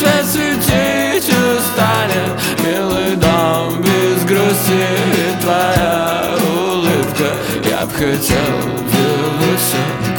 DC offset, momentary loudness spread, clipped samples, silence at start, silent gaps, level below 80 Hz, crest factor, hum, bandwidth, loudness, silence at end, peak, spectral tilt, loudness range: under 0.1%; 4 LU; under 0.1%; 0 s; none; -38 dBFS; 14 dB; none; over 20 kHz; -14 LUFS; 0 s; 0 dBFS; -4.5 dB/octave; 2 LU